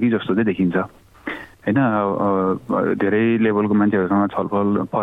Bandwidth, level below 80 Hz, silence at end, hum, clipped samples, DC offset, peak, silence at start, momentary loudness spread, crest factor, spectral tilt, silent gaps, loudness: 4 kHz; -56 dBFS; 0 s; none; under 0.1%; under 0.1%; -6 dBFS; 0 s; 11 LU; 12 dB; -9.5 dB/octave; none; -19 LUFS